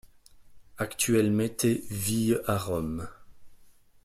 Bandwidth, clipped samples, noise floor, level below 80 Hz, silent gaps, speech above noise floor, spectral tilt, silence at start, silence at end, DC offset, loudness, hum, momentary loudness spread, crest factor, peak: 16 kHz; under 0.1%; -55 dBFS; -54 dBFS; none; 28 dB; -5 dB/octave; 0.35 s; 0.35 s; under 0.1%; -28 LUFS; none; 11 LU; 16 dB; -12 dBFS